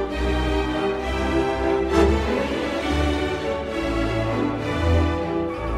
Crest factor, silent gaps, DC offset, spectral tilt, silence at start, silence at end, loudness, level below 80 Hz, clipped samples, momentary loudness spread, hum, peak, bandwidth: 16 dB; none; under 0.1%; -6.5 dB/octave; 0 s; 0 s; -23 LUFS; -30 dBFS; under 0.1%; 5 LU; none; -6 dBFS; 13 kHz